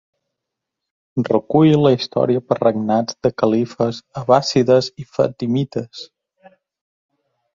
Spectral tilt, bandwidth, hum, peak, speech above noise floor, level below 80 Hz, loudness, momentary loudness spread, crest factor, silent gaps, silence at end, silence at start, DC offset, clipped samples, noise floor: -6.5 dB/octave; 7.6 kHz; none; -2 dBFS; 64 dB; -58 dBFS; -18 LUFS; 12 LU; 18 dB; none; 1.5 s; 1.15 s; under 0.1%; under 0.1%; -81 dBFS